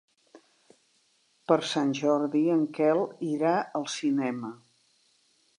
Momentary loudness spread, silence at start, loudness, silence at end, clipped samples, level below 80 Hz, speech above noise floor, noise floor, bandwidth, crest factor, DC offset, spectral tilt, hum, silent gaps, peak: 8 LU; 1.5 s; -27 LUFS; 1.05 s; under 0.1%; -84 dBFS; 42 dB; -68 dBFS; 10.5 kHz; 20 dB; under 0.1%; -5.5 dB/octave; none; none; -8 dBFS